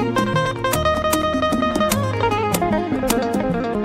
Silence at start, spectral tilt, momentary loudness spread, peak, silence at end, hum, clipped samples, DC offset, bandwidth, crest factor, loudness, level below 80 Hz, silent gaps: 0 s; -5 dB/octave; 2 LU; -4 dBFS; 0 s; none; under 0.1%; under 0.1%; 16 kHz; 16 dB; -19 LUFS; -36 dBFS; none